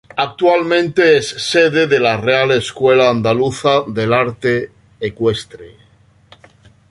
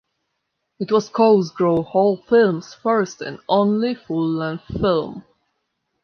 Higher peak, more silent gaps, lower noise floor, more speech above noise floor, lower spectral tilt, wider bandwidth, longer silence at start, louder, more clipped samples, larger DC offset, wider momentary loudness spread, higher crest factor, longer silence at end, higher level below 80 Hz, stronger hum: first, 0 dBFS vs -4 dBFS; neither; second, -50 dBFS vs -75 dBFS; second, 36 dB vs 57 dB; second, -5 dB/octave vs -7 dB/octave; first, 11.5 kHz vs 7 kHz; second, 0.15 s vs 0.8 s; first, -14 LUFS vs -19 LUFS; neither; neither; about the same, 9 LU vs 11 LU; about the same, 14 dB vs 16 dB; first, 1.2 s vs 0.85 s; about the same, -50 dBFS vs -50 dBFS; neither